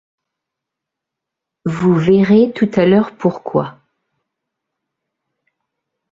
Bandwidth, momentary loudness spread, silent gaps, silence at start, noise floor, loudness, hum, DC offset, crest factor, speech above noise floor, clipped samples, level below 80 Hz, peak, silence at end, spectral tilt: 7.6 kHz; 12 LU; none; 1.65 s; -82 dBFS; -14 LUFS; none; under 0.1%; 16 dB; 69 dB; under 0.1%; -56 dBFS; -2 dBFS; 2.4 s; -8.5 dB/octave